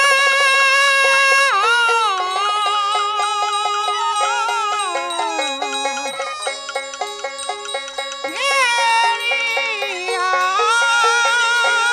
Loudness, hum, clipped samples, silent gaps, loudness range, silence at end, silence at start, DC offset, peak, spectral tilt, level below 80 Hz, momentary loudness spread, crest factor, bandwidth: -16 LUFS; 60 Hz at -70 dBFS; under 0.1%; none; 8 LU; 0 s; 0 s; under 0.1%; -4 dBFS; 2 dB/octave; -64 dBFS; 13 LU; 14 dB; 16 kHz